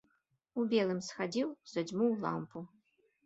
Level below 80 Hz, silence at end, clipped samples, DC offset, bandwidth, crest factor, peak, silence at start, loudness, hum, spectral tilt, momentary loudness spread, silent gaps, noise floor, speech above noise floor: -80 dBFS; 0.6 s; under 0.1%; under 0.1%; 8 kHz; 18 dB; -18 dBFS; 0.55 s; -35 LUFS; none; -5.5 dB/octave; 14 LU; none; -77 dBFS; 43 dB